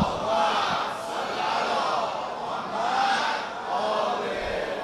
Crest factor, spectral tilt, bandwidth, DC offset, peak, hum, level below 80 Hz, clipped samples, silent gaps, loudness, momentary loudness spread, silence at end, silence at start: 16 dB; -3.5 dB/octave; 14 kHz; under 0.1%; -10 dBFS; none; -54 dBFS; under 0.1%; none; -26 LUFS; 7 LU; 0 s; 0 s